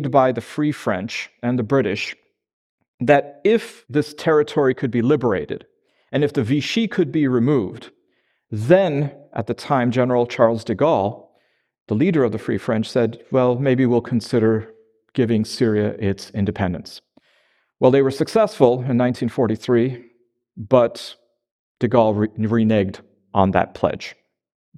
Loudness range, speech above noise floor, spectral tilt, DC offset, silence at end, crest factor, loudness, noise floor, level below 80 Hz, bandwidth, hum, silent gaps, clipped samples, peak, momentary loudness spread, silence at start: 2 LU; 48 dB; -7 dB/octave; under 0.1%; 0.65 s; 20 dB; -20 LUFS; -67 dBFS; -56 dBFS; 12.5 kHz; none; 2.53-2.78 s, 2.88-2.98 s, 11.81-11.86 s, 21.51-21.75 s; under 0.1%; 0 dBFS; 10 LU; 0 s